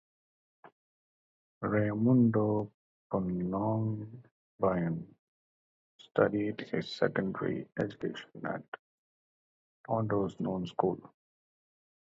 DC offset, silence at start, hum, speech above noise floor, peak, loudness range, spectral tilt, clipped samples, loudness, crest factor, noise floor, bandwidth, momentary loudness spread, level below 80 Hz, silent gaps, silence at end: under 0.1%; 0.65 s; none; over 59 dB; -12 dBFS; 6 LU; -8.5 dB/octave; under 0.1%; -32 LUFS; 22 dB; under -90 dBFS; 7.8 kHz; 14 LU; -64 dBFS; 0.72-1.61 s, 2.74-3.10 s, 4.31-4.59 s, 5.19-5.99 s, 8.68-8.72 s, 8.79-9.84 s; 1 s